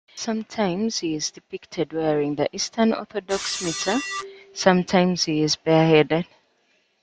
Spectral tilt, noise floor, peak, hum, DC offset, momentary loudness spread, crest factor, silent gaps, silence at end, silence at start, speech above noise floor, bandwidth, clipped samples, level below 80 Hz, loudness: -4.5 dB/octave; -66 dBFS; -2 dBFS; none; under 0.1%; 11 LU; 20 dB; none; 0.8 s; 0.15 s; 43 dB; 9.4 kHz; under 0.1%; -60 dBFS; -22 LUFS